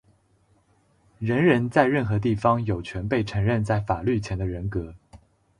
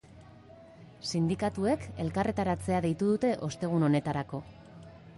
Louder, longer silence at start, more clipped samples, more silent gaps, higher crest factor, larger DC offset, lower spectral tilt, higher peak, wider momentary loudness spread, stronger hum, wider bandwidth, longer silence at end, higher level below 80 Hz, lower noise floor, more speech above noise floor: first, -24 LUFS vs -30 LUFS; first, 1.2 s vs 0.1 s; neither; neither; about the same, 20 dB vs 16 dB; neither; first, -8 dB/octave vs -6.5 dB/octave; first, -6 dBFS vs -16 dBFS; second, 10 LU vs 14 LU; neither; about the same, 10.5 kHz vs 11.5 kHz; first, 0.4 s vs 0 s; first, -44 dBFS vs -54 dBFS; first, -63 dBFS vs -53 dBFS; first, 40 dB vs 23 dB